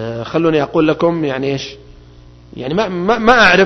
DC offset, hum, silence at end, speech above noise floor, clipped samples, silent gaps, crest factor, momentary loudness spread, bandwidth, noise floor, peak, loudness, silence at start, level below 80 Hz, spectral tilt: under 0.1%; 60 Hz at -40 dBFS; 0 s; 27 dB; under 0.1%; none; 14 dB; 12 LU; 7.4 kHz; -40 dBFS; 0 dBFS; -14 LUFS; 0 s; -40 dBFS; -5.5 dB/octave